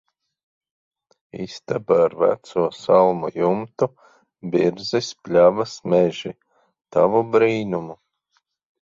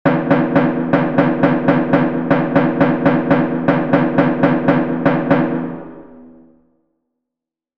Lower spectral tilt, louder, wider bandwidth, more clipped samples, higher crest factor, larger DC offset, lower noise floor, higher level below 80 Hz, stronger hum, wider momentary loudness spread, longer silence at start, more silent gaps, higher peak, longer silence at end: second, -6 dB/octave vs -10 dB/octave; second, -20 LUFS vs -15 LUFS; first, 7.6 kHz vs 5.6 kHz; neither; about the same, 18 dB vs 16 dB; second, under 0.1% vs 1%; second, -70 dBFS vs -85 dBFS; second, -62 dBFS vs -48 dBFS; neither; first, 16 LU vs 3 LU; first, 1.35 s vs 0.05 s; neither; second, -4 dBFS vs 0 dBFS; second, 0.85 s vs 1.5 s